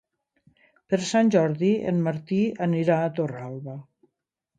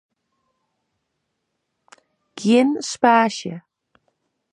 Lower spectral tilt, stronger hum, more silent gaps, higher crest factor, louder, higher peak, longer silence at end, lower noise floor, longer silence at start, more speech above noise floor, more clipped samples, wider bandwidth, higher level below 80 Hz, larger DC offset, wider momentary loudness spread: first, -6.5 dB/octave vs -4.5 dB/octave; neither; neither; about the same, 18 dB vs 22 dB; second, -24 LUFS vs -18 LUFS; second, -8 dBFS vs -2 dBFS; second, 0.75 s vs 0.95 s; first, -80 dBFS vs -76 dBFS; second, 0.9 s vs 2.35 s; about the same, 56 dB vs 58 dB; neither; second, 9.4 kHz vs 11 kHz; about the same, -68 dBFS vs -72 dBFS; neither; about the same, 15 LU vs 16 LU